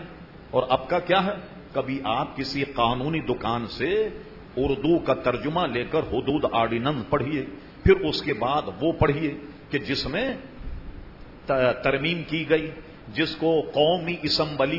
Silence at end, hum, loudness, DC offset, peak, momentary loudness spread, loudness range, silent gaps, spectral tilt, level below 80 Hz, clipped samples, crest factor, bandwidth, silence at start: 0 s; none; -25 LUFS; under 0.1%; -6 dBFS; 14 LU; 3 LU; none; -7 dB/octave; -44 dBFS; under 0.1%; 20 dB; 6 kHz; 0 s